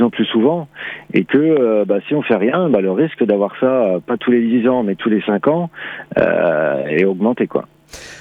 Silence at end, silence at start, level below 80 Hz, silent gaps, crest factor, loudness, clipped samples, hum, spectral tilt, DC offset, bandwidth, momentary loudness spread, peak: 0 s; 0 s; -56 dBFS; none; 14 dB; -16 LUFS; under 0.1%; none; -7.5 dB/octave; under 0.1%; 10 kHz; 9 LU; -2 dBFS